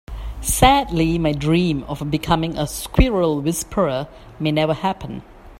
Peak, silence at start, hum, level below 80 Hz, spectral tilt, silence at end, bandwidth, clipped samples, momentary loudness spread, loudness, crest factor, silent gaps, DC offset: 0 dBFS; 0.1 s; none; -30 dBFS; -5 dB/octave; 0.05 s; 16 kHz; under 0.1%; 12 LU; -19 LUFS; 20 dB; none; under 0.1%